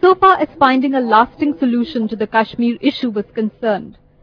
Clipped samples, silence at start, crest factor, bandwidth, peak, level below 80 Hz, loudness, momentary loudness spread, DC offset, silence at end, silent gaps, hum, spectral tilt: under 0.1%; 0 s; 16 dB; 5.4 kHz; 0 dBFS; -50 dBFS; -16 LUFS; 9 LU; under 0.1%; 0.3 s; none; none; -7.5 dB/octave